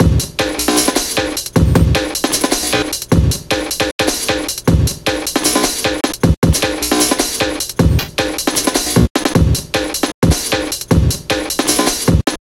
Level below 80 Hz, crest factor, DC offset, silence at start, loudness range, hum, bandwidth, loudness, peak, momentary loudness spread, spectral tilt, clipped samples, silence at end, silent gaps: -24 dBFS; 14 dB; under 0.1%; 0 s; 1 LU; none; 17 kHz; -15 LUFS; 0 dBFS; 4 LU; -4 dB/octave; under 0.1%; 0.1 s; 3.92-3.99 s, 6.37-6.42 s, 9.10-9.15 s, 10.14-10.22 s